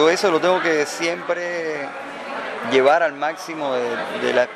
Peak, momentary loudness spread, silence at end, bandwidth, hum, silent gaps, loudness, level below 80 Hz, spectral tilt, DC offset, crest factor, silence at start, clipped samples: -2 dBFS; 12 LU; 0 s; 14.5 kHz; none; none; -21 LUFS; -68 dBFS; -3.5 dB/octave; under 0.1%; 18 dB; 0 s; under 0.1%